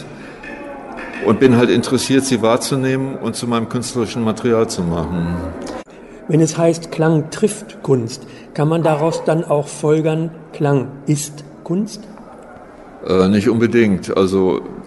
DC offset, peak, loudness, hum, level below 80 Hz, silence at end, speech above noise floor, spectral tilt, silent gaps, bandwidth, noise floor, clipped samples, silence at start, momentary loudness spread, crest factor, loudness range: under 0.1%; 0 dBFS; -17 LUFS; none; -46 dBFS; 0 s; 21 dB; -6 dB/octave; none; 12 kHz; -38 dBFS; under 0.1%; 0 s; 17 LU; 16 dB; 4 LU